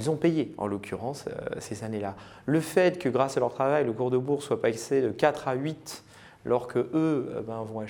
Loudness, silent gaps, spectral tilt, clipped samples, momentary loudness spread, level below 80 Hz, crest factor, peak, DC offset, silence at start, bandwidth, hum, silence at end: -28 LUFS; none; -6 dB/octave; under 0.1%; 11 LU; -64 dBFS; 20 dB; -8 dBFS; under 0.1%; 0 s; 20 kHz; none; 0 s